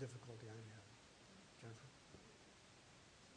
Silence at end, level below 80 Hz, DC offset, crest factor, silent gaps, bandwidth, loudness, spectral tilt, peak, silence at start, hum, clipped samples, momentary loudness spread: 0 s; -80 dBFS; under 0.1%; 20 dB; none; 10 kHz; -60 LUFS; -5 dB/octave; -38 dBFS; 0 s; none; under 0.1%; 8 LU